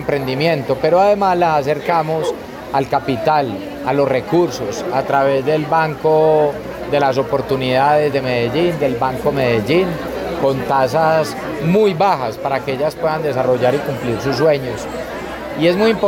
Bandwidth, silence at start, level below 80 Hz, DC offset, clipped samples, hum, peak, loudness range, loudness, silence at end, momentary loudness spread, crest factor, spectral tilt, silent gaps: 17 kHz; 0 s; -44 dBFS; under 0.1%; under 0.1%; none; -4 dBFS; 2 LU; -17 LUFS; 0 s; 8 LU; 12 dB; -6 dB/octave; none